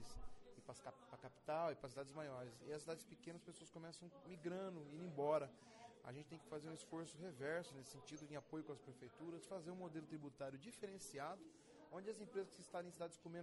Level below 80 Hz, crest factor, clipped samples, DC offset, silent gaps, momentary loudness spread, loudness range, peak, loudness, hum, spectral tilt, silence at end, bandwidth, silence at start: -74 dBFS; 22 dB; under 0.1%; under 0.1%; none; 14 LU; 5 LU; -30 dBFS; -52 LUFS; none; -5 dB/octave; 0 s; 11.5 kHz; 0 s